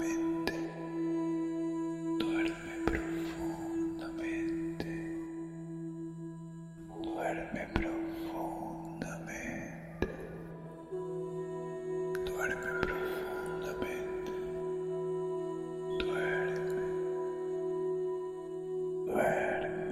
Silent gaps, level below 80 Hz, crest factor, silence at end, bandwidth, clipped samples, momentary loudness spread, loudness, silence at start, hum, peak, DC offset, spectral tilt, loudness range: none; -54 dBFS; 26 dB; 0 s; 15 kHz; under 0.1%; 9 LU; -37 LUFS; 0 s; none; -10 dBFS; under 0.1%; -6 dB/octave; 5 LU